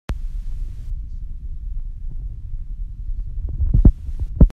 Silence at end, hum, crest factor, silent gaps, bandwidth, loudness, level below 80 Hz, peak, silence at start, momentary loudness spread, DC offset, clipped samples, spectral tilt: 0 s; none; 20 dB; none; 3.2 kHz; -26 LUFS; -20 dBFS; 0 dBFS; 0.1 s; 18 LU; under 0.1%; under 0.1%; -10.5 dB/octave